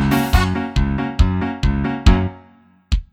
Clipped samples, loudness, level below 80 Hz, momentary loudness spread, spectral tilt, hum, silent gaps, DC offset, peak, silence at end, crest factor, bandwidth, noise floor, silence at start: under 0.1%; -19 LUFS; -20 dBFS; 7 LU; -6.5 dB/octave; none; none; under 0.1%; 0 dBFS; 0.1 s; 18 dB; 17.5 kHz; -50 dBFS; 0 s